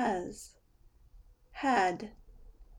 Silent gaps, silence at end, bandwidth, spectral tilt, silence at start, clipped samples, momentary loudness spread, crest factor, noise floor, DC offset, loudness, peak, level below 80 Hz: none; 0 s; 17 kHz; -4.5 dB/octave; 0 s; under 0.1%; 22 LU; 20 dB; -62 dBFS; under 0.1%; -32 LUFS; -16 dBFS; -58 dBFS